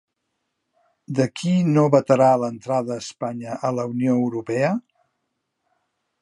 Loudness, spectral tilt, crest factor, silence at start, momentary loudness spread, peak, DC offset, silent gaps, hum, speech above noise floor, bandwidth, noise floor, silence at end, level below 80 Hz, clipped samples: -21 LUFS; -7 dB/octave; 20 dB; 1.1 s; 12 LU; -2 dBFS; under 0.1%; none; none; 56 dB; 11.5 kHz; -77 dBFS; 1.4 s; -68 dBFS; under 0.1%